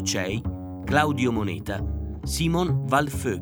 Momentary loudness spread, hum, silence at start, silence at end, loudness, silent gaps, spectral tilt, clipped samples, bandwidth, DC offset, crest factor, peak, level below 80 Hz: 9 LU; none; 0 s; 0 s; -25 LUFS; none; -5 dB/octave; under 0.1%; over 20 kHz; under 0.1%; 20 dB; -4 dBFS; -38 dBFS